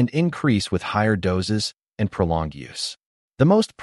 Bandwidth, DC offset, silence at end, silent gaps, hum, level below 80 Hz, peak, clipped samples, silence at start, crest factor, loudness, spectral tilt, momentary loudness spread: 11.5 kHz; under 0.1%; 0 s; 3.06-3.29 s; none; -44 dBFS; -6 dBFS; under 0.1%; 0 s; 16 dB; -22 LUFS; -6 dB/octave; 11 LU